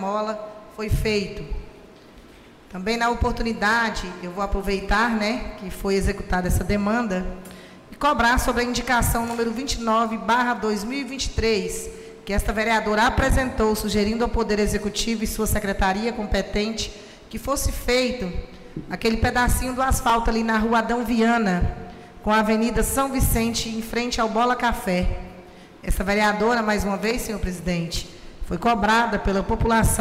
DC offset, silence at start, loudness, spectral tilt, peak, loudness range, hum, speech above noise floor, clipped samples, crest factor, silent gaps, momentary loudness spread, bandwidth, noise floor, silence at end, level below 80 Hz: under 0.1%; 0 s; -23 LUFS; -4.5 dB/octave; -10 dBFS; 3 LU; none; 25 dB; under 0.1%; 12 dB; none; 13 LU; 16 kHz; -47 dBFS; 0 s; -32 dBFS